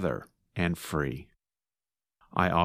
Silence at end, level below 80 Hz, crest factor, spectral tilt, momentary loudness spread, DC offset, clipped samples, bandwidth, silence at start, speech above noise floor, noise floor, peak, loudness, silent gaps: 0 s; -50 dBFS; 24 dB; -6 dB/octave; 12 LU; under 0.1%; under 0.1%; 15.5 kHz; 0 s; over 61 dB; under -90 dBFS; -8 dBFS; -32 LUFS; none